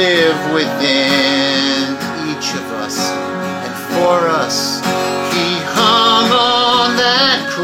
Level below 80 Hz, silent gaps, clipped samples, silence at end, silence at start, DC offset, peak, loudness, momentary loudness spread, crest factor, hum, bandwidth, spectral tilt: -56 dBFS; none; under 0.1%; 0 s; 0 s; under 0.1%; 0 dBFS; -14 LUFS; 10 LU; 14 dB; none; 17 kHz; -3 dB/octave